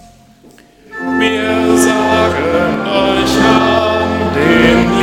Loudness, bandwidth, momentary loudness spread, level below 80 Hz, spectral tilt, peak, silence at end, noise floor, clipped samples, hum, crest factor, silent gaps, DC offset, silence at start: -11 LUFS; 16.5 kHz; 5 LU; -34 dBFS; -4.5 dB/octave; 0 dBFS; 0 s; -43 dBFS; under 0.1%; none; 12 dB; none; under 0.1%; 0.9 s